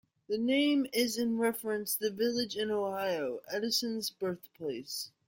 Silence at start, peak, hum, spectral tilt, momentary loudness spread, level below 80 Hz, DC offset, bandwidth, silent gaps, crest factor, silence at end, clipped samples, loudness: 0.3 s; -16 dBFS; none; -3 dB/octave; 9 LU; -76 dBFS; under 0.1%; 17 kHz; none; 18 dB; 0.2 s; under 0.1%; -32 LUFS